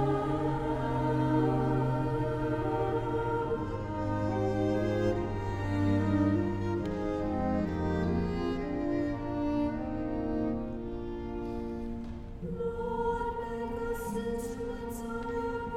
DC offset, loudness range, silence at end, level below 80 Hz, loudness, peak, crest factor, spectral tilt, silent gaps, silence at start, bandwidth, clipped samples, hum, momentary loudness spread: under 0.1%; 5 LU; 0 s; -44 dBFS; -32 LUFS; -16 dBFS; 16 dB; -8 dB/octave; none; 0 s; 15 kHz; under 0.1%; none; 9 LU